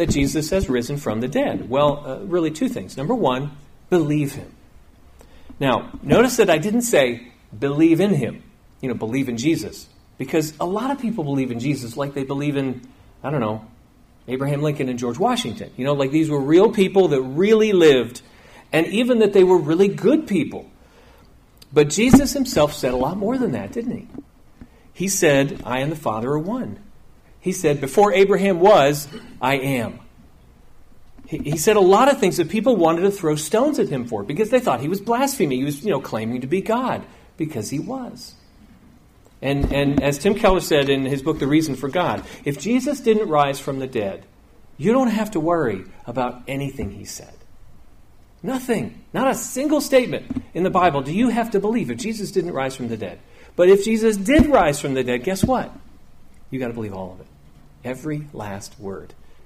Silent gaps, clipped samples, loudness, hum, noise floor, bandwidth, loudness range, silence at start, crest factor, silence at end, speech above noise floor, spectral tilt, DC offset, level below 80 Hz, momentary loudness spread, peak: none; under 0.1%; -20 LUFS; none; -51 dBFS; 15.5 kHz; 8 LU; 0 s; 20 dB; 0.15 s; 32 dB; -5.5 dB/octave; under 0.1%; -42 dBFS; 15 LU; 0 dBFS